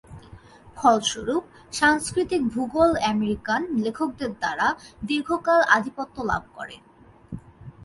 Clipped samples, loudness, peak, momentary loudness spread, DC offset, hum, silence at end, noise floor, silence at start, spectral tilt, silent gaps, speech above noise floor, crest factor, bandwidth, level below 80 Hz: under 0.1%; -23 LUFS; -2 dBFS; 16 LU; under 0.1%; none; 0 s; -47 dBFS; 0.1 s; -4 dB/octave; none; 24 dB; 22 dB; 11.5 kHz; -50 dBFS